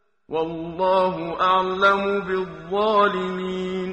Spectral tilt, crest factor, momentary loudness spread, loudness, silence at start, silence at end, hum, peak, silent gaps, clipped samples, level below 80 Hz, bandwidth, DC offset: -6.5 dB/octave; 18 dB; 9 LU; -22 LUFS; 0.3 s; 0 s; none; -4 dBFS; none; under 0.1%; -54 dBFS; 8.8 kHz; under 0.1%